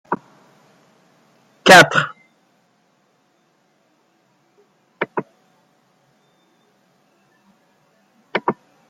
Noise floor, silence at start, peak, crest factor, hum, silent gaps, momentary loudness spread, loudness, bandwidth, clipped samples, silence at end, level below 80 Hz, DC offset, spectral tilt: -62 dBFS; 0.1 s; 0 dBFS; 22 dB; none; none; 20 LU; -15 LUFS; 16 kHz; under 0.1%; 0.35 s; -62 dBFS; under 0.1%; -3 dB/octave